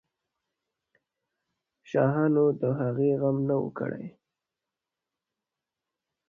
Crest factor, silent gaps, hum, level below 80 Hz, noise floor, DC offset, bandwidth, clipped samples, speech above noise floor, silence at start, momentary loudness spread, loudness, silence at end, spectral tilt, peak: 20 dB; none; none; -68 dBFS; -88 dBFS; under 0.1%; 6.8 kHz; under 0.1%; 63 dB; 1.9 s; 11 LU; -27 LUFS; 2.2 s; -10.5 dB/octave; -10 dBFS